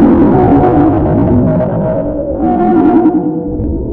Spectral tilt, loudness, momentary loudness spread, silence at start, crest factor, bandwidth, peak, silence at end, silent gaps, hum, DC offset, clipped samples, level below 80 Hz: -12 dB/octave; -10 LUFS; 9 LU; 0 s; 10 dB; 3.9 kHz; 0 dBFS; 0 s; none; none; under 0.1%; 0.3%; -24 dBFS